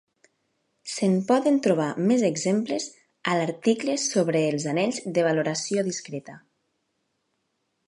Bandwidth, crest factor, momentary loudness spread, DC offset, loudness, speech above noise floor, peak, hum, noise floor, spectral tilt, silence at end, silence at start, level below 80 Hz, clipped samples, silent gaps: 11.5 kHz; 18 dB; 11 LU; under 0.1%; -24 LUFS; 52 dB; -8 dBFS; none; -76 dBFS; -5 dB/octave; 1.5 s; 0.85 s; -76 dBFS; under 0.1%; none